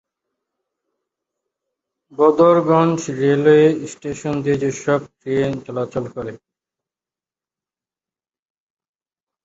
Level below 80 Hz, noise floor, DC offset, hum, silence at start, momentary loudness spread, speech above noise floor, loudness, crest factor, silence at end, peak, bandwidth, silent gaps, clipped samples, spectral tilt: -56 dBFS; under -90 dBFS; under 0.1%; none; 2.2 s; 15 LU; over 73 dB; -17 LUFS; 18 dB; 3.1 s; -2 dBFS; 8 kHz; none; under 0.1%; -6.5 dB/octave